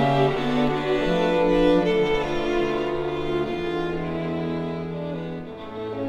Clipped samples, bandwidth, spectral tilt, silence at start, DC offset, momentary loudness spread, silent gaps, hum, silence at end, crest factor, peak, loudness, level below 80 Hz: under 0.1%; 11 kHz; -7 dB/octave; 0 s; under 0.1%; 12 LU; none; none; 0 s; 14 dB; -8 dBFS; -24 LUFS; -40 dBFS